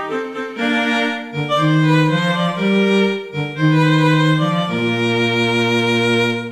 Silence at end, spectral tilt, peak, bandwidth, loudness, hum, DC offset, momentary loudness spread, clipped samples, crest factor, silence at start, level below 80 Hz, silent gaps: 0 s; -6 dB/octave; -4 dBFS; 13 kHz; -16 LUFS; none; under 0.1%; 8 LU; under 0.1%; 12 dB; 0 s; -58 dBFS; none